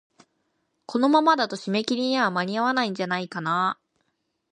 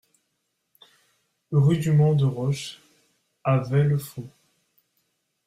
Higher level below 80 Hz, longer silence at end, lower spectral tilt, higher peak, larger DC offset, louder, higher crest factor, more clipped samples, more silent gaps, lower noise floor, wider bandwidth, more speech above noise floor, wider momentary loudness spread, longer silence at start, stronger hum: second, -76 dBFS vs -60 dBFS; second, 0.8 s vs 1.2 s; second, -5 dB/octave vs -7.5 dB/octave; first, -6 dBFS vs -10 dBFS; neither; about the same, -24 LUFS vs -23 LUFS; about the same, 20 dB vs 16 dB; neither; neither; about the same, -75 dBFS vs -76 dBFS; second, 9.8 kHz vs 14.5 kHz; about the same, 52 dB vs 55 dB; second, 8 LU vs 18 LU; second, 0.9 s vs 1.5 s; neither